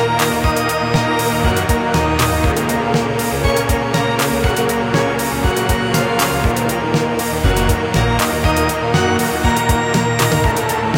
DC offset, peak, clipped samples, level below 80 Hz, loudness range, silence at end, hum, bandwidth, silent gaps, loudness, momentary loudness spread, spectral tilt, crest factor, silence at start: under 0.1%; -2 dBFS; under 0.1%; -26 dBFS; 1 LU; 0 s; none; 17 kHz; none; -16 LUFS; 2 LU; -5 dB/octave; 14 dB; 0 s